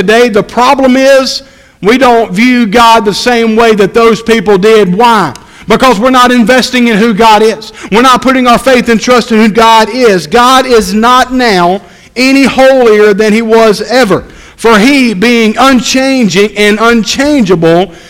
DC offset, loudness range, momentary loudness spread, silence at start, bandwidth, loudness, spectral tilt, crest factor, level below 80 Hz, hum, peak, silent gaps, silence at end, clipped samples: under 0.1%; 1 LU; 5 LU; 0 s; 17 kHz; -5 LUFS; -4.5 dB/octave; 6 dB; -34 dBFS; none; 0 dBFS; none; 0.15 s; 6%